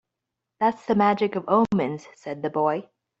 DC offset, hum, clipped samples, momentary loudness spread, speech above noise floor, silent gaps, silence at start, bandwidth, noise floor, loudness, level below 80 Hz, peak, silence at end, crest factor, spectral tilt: under 0.1%; none; under 0.1%; 11 LU; 61 dB; none; 0.6 s; 7.8 kHz; -84 dBFS; -24 LUFS; -64 dBFS; -6 dBFS; 0.4 s; 18 dB; -7.5 dB/octave